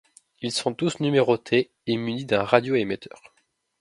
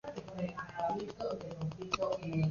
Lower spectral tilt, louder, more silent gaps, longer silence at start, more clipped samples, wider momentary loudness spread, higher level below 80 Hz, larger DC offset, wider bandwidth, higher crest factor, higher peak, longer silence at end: about the same, -5 dB/octave vs -5.5 dB/octave; first, -24 LUFS vs -38 LUFS; neither; first, 0.4 s vs 0.05 s; neither; first, 10 LU vs 6 LU; about the same, -64 dBFS vs -62 dBFS; neither; first, 11.5 kHz vs 7.2 kHz; about the same, 24 dB vs 20 dB; first, 0 dBFS vs -18 dBFS; first, 0.75 s vs 0 s